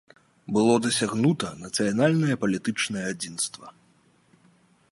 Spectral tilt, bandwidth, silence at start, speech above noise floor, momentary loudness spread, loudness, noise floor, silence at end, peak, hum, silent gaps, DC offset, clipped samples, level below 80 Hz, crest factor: -4.5 dB/octave; 11.5 kHz; 0.5 s; 37 dB; 9 LU; -25 LUFS; -62 dBFS; 1.2 s; -8 dBFS; none; none; under 0.1%; under 0.1%; -64 dBFS; 18 dB